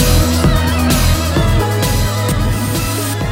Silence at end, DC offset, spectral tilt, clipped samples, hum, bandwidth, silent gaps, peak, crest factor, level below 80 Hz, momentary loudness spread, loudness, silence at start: 0 s; under 0.1%; -5 dB/octave; under 0.1%; none; 16.5 kHz; none; -2 dBFS; 10 dB; -20 dBFS; 4 LU; -14 LUFS; 0 s